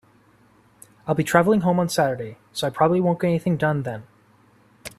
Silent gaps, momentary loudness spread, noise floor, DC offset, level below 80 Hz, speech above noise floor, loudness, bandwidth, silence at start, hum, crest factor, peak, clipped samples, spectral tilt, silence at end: none; 14 LU; -57 dBFS; under 0.1%; -58 dBFS; 36 dB; -22 LUFS; 14.5 kHz; 1.05 s; none; 22 dB; -2 dBFS; under 0.1%; -6 dB/octave; 0.1 s